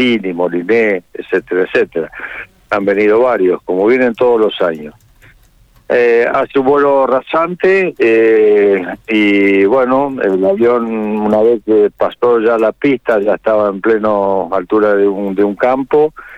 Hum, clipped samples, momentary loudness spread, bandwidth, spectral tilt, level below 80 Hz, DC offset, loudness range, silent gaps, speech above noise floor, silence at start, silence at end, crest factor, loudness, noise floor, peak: none; under 0.1%; 7 LU; 7.4 kHz; -7 dB/octave; -50 dBFS; under 0.1%; 3 LU; none; 35 dB; 0 s; 0 s; 10 dB; -12 LUFS; -47 dBFS; -4 dBFS